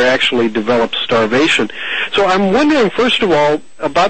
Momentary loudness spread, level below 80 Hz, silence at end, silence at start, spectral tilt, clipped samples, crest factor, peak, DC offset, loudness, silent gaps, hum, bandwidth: 5 LU; -46 dBFS; 0 s; 0 s; -4.5 dB/octave; under 0.1%; 12 dB; -2 dBFS; 2%; -13 LUFS; none; none; 8.8 kHz